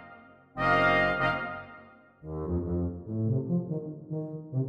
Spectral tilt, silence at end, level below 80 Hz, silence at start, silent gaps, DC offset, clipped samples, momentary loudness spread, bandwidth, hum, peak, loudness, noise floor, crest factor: -8 dB/octave; 0 s; -48 dBFS; 0 s; none; under 0.1%; under 0.1%; 18 LU; 8.6 kHz; none; -12 dBFS; -29 LUFS; -53 dBFS; 18 dB